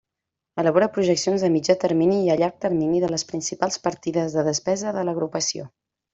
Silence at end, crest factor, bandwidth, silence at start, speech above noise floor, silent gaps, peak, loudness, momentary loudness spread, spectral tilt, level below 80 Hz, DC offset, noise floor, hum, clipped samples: 0.45 s; 18 dB; 8.2 kHz; 0.55 s; 63 dB; none; -4 dBFS; -22 LUFS; 6 LU; -4.5 dB/octave; -62 dBFS; under 0.1%; -85 dBFS; none; under 0.1%